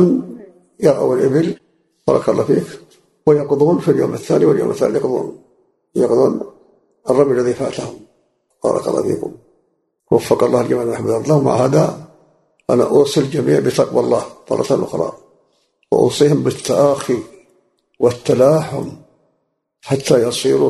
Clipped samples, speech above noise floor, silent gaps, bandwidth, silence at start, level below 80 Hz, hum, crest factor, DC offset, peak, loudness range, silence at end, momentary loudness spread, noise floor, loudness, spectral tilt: under 0.1%; 54 dB; none; 12.5 kHz; 0 s; -54 dBFS; none; 16 dB; under 0.1%; 0 dBFS; 3 LU; 0 s; 11 LU; -69 dBFS; -16 LUFS; -6.5 dB/octave